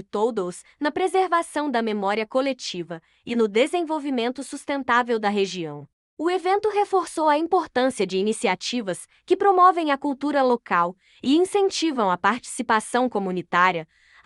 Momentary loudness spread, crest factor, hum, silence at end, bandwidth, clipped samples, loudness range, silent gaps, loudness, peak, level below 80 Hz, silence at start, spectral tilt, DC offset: 10 LU; 18 dB; none; 0.4 s; 12 kHz; under 0.1%; 4 LU; 5.93-6.17 s; -23 LUFS; -4 dBFS; -68 dBFS; 0 s; -4 dB/octave; under 0.1%